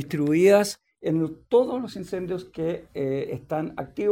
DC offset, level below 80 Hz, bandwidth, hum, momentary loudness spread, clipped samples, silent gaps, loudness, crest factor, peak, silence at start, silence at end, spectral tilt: under 0.1%; -60 dBFS; 16.5 kHz; none; 14 LU; under 0.1%; none; -25 LUFS; 16 dB; -8 dBFS; 0 s; 0 s; -6 dB/octave